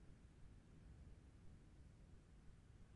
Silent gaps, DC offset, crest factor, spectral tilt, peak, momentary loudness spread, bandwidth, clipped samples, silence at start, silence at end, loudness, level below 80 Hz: none; under 0.1%; 14 dB; -6.5 dB/octave; -50 dBFS; 3 LU; 10.5 kHz; under 0.1%; 0 s; 0 s; -67 LUFS; -66 dBFS